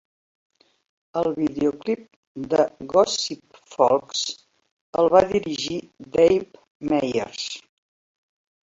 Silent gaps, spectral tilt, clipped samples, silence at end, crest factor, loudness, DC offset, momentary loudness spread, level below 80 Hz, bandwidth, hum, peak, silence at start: 2.16-2.35 s, 4.71-4.93 s, 6.70-6.80 s; -4 dB/octave; under 0.1%; 1.05 s; 22 dB; -23 LUFS; under 0.1%; 17 LU; -58 dBFS; 8 kHz; none; -2 dBFS; 1.15 s